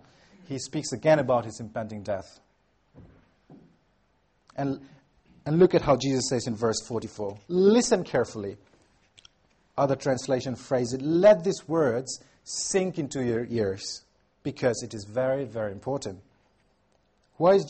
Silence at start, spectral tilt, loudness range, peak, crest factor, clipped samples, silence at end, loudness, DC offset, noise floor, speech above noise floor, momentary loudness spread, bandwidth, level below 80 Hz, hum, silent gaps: 0.5 s; -5 dB/octave; 8 LU; -8 dBFS; 20 dB; under 0.1%; 0 s; -26 LUFS; under 0.1%; -68 dBFS; 43 dB; 16 LU; 8.8 kHz; -58 dBFS; none; none